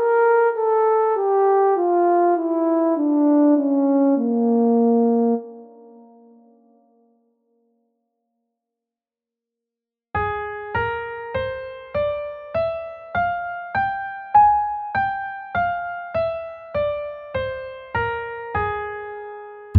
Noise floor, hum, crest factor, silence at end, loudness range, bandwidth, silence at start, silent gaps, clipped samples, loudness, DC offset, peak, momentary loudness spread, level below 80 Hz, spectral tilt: -89 dBFS; none; 18 dB; 0 s; 11 LU; 4.6 kHz; 0 s; none; under 0.1%; -21 LUFS; under 0.1%; -2 dBFS; 12 LU; -50 dBFS; -10 dB/octave